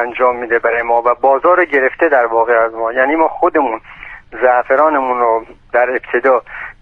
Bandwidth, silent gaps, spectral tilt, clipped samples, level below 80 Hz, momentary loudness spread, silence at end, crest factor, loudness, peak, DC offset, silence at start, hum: 4.2 kHz; none; -6.5 dB/octave; under 0.1%; -48 dBFS; 8 LU; 0.1 s; 12 dB; -13 LUFS; 0 dBFS; under 0.1%; 0 s; none